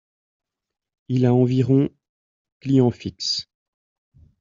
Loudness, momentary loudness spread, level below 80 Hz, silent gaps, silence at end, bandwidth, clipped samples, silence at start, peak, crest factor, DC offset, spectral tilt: -21 LUFS; 9 LU; -58 dBFS; 2.09-2.45 s, 2.52-2.60 s; 1 s; 7.6 kHz; under 0.1%; 1.1 s; -6 dBFS; 18 dB; under 0.1%; -7.5 dB/octave